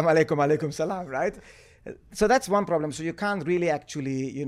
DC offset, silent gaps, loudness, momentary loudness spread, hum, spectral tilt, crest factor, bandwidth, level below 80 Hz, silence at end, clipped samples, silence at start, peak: under 0.1%; none; -26 LUFS; 11 LU; none; -5.5 dB/octave; 18 dB; 15 kHz; -54 dBFS; 0 s; under 0.1%; 0 s; -8 dBFS